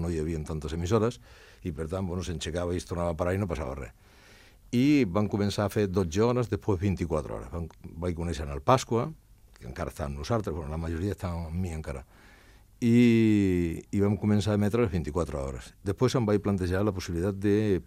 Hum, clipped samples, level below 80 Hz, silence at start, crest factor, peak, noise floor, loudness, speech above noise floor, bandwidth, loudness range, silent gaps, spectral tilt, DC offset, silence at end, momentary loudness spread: none; under 0.1%; -46 dBFS; 0 s; 22 dB; -6 dBFS; -55 dBFS; -28 LUFS; 27 dB; 15.5 kHz; 7 LU; none; -7 dB/octave; under 0.1%; 0.05 s; 13 LU